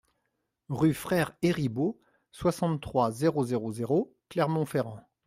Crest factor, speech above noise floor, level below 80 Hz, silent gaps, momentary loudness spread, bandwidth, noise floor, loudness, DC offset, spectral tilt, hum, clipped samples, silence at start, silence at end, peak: 16 dB; 52 dB; -60 dBFS; none; 6 LU; 16 kHz; -80 dBFS; -29 LUFS; under 0.1%; -7 dB/octave; none; under 0.1%; 0.7 s; 0.25 s; -12 dBFS